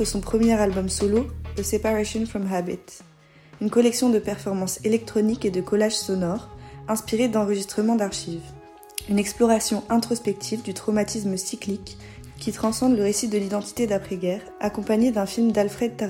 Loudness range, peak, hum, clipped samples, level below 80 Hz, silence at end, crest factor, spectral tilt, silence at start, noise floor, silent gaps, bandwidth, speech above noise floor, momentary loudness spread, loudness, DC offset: 2 LU; -6 dBFS; none; under 0.1%; -46 dBFS; 0 s; 18 dB; -5 dB/octave; 0 s; -50 dBFS; none; 17 kHz; 27 dB; 11 LU; -24 LUFS; under 0.1%